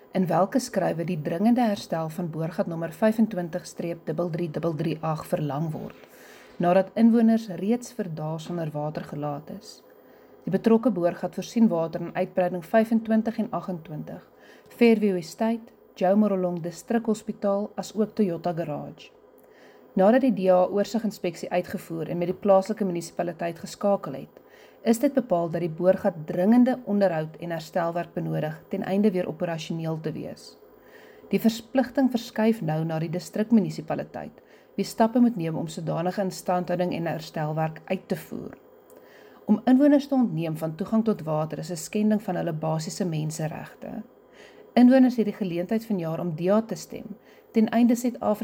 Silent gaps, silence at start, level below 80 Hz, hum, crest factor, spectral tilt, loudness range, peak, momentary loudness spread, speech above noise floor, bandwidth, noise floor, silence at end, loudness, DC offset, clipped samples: none; 0.15 s; -66 dBFS; none; 18 dB; -7 dB/octave; 5 LU; -6 dBFS; 13 LU; 28 dB; 17 kHz; -53 dBFS; 0 s; -25 LUFS; under 0.1%; under 0.1%